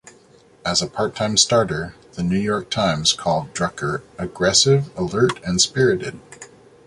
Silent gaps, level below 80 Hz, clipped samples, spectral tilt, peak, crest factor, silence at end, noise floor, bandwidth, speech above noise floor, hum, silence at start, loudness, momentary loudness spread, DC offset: none; -48 dBFS; under 0.1%; -3.5 dB/octave; -2 dBFS; 20 dB; 0.4 s; -51 dBFS; 11.5 kHz; 31 dB; none; 0.05 s; -19 LUFS; 13 LU; under 0.1%